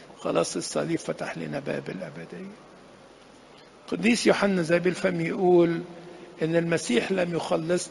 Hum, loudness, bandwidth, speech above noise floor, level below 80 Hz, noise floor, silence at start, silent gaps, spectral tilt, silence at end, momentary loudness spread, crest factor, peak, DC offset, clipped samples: none; -26 LUFS; 11.5 kHz; 25 dB; -64 dBFS; -51 dBFS; 0 s; none; -5 dB/octave; 0 s; 18 LU; 20 dB; -6 dBFS; under 0.1%; under 0.1%